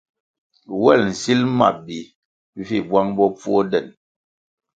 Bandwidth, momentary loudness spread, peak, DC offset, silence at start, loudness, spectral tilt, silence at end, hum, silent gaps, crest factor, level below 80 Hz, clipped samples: 9.2 kHz; 17 LU; 0 dBFS; under 0.1%; 0.7 s; -18 LUFS; -5.5 dB/octave; 0.85 s; none; 2.15-2.53 s; 20 dB; -58 dBFS; under 0.1%